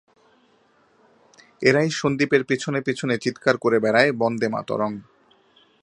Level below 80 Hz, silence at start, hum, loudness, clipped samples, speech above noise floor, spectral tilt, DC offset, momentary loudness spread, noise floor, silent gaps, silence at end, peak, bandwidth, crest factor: -64 dBFS; 1.6 s; none; -21 LUFS; under 0.1%; 39 dB; -5.5 dB/octave; under 0.1%; 7 LU; -60 dBFS; none; 0.8 s; -2 dBFS; 11 kHz; 22 dB